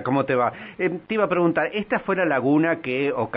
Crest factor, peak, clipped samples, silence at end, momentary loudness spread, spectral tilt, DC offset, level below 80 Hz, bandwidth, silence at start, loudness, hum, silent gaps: 14 dB; -8 dBFS; under 0.1%; 0 s; 6 LU; -5 dB/octave; under 0.1%; -62 dBFS; 5 kHz; 0 s; -22 LUFS; none; none